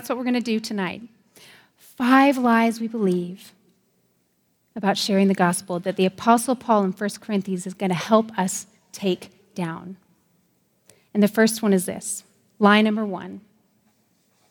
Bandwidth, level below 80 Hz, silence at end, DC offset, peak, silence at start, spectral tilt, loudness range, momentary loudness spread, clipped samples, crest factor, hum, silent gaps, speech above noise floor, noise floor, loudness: over 20 kHz; -72 dBFS; 1.1 s; under 0.1%; -2 dBFS; 0 s; -5 dB/octave; 4 LU; 16 LU; under 0.1%; 22 dB; none; none; 46 dB; -68 dBFS; -22 LUFS